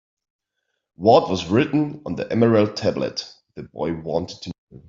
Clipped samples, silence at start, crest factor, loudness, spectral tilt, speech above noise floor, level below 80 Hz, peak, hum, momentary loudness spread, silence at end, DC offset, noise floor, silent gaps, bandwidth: under 0.1%; 1 s; 20 dB; -21 LUFS; -6.5 dB/octave; 57 dB; -58 dBFS; -2 dBFS; none; 19 LU; 0.1 s; under 0.1%; -77 dBFS; 4.58-4.67 s; 7.6 kHz